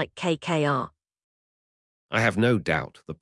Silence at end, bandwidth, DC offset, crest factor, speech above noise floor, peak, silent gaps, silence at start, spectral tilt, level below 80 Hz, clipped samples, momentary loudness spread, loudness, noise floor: 0.1 s; 12 kHz; under 0.1%; 20 dB; over 65 dB; -8 dBFS; 1.24-2.09 s; 0 s; -6 dB/octave; -58 dBFS; under 0.1%; 8 LU; -25 LUFS; under -90 dBFS